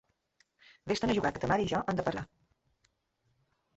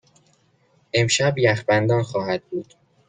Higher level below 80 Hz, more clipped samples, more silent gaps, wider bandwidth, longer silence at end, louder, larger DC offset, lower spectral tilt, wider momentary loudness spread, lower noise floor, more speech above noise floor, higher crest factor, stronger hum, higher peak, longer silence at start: about the same, -56 dBFS vs -60 dBFS; neither; neither; second, 8.2 kHz vs 9.6 kHz; first, 1.5 s vs 0.45 s; second, -32 LUFS vs -20 LUFS; neither; about the same, -5.5 dB/octave vs -4.5 dB/octave; first, 14 LU vs 10 LU; first, -77 dBFS vs -61 dBFS; first, 46 dB vs 41 dB; about the same, 20 dB vs 18 dB; neither; second, -14 dBFS vs -4 dBFS; about the same, 0.85 s vs 0.95 s